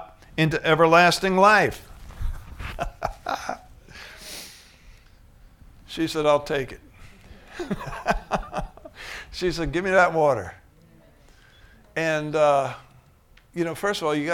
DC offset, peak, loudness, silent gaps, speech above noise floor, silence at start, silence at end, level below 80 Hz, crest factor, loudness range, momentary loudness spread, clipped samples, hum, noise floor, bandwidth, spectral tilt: under 0.1%; -4 dBFS; -22 LUFS; none; 33 dB; 0 s; 0 s; -42 dBFS; 22 dB; 14 LU; 23 LU; under 0.1%; none; -55 dBFS; 18 kHz; -5 dB/octave